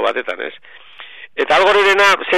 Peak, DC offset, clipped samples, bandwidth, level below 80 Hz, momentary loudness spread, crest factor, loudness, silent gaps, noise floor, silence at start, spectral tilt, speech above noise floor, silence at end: -4 dBFS; under 0.1%; under 0.1%; 14 kHz; -54 dBFS; 18 LU; 12 dB; -13 LUFS; none; -38 dBFS; 0 s; -2 dB/octave; 23 dB; 0 s